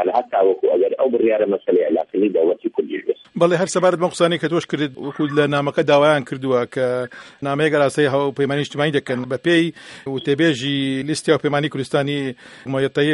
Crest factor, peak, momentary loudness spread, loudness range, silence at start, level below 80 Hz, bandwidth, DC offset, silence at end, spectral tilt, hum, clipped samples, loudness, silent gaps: 18 dB; -2 dBFS; 8 LU; 2 LU; 0 s; -64 dBFS; 11.5 kHz; under 0.1%; 0 s; -5.5 dB/octave; none; under 0.1%; -19 LUFS; none